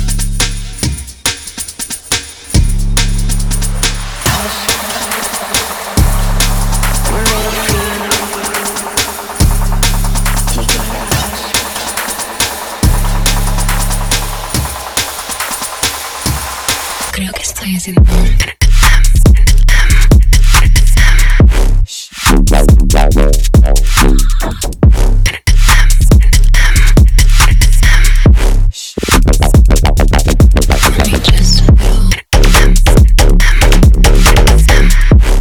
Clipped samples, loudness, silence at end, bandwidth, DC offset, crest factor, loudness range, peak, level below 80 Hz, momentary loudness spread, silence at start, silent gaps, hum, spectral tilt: 0.5%; -11 LUFS; 0 s; over 20 kHz; under 0.1%; 8 dB; 6 LU; 0 dBFS; -10 dBFS; 8 LU; 0 s; none; none; -4 dB/octave